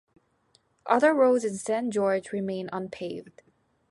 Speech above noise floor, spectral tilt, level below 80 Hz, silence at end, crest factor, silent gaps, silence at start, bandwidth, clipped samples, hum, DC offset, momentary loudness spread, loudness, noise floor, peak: 41 dB; -5.5 dB/octave; -72 dBFS; 0.6 s; 20 dB; none; 0.85 s; 11.5 kHz; under 0.1%; none; under 0.1%; 16 LU; -26 LUFS; -67 dBFS; -8 dBFS